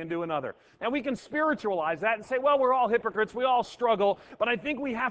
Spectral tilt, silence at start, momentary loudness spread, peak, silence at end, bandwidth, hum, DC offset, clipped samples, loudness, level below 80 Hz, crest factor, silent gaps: -5.5 dB/octave; 0 s; 8 LU; -12 dBFS; 0 s; 8 kHz; none; under 0.1%; under 0.1%; -27 LUFS; -66 dBFS; 16 dB; none